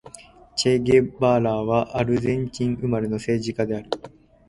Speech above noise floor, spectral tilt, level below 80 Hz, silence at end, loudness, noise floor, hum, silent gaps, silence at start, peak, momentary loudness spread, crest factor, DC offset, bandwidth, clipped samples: 25 dB; -6 dB/octave; -48 dBFS; 0.4 s; -23 LUFS; -46 dBFS; none; none; 0.05 s; -4 dBFS; 9 LU; 18 dB; under 0.1%; 11.5 kHz; under 0.1%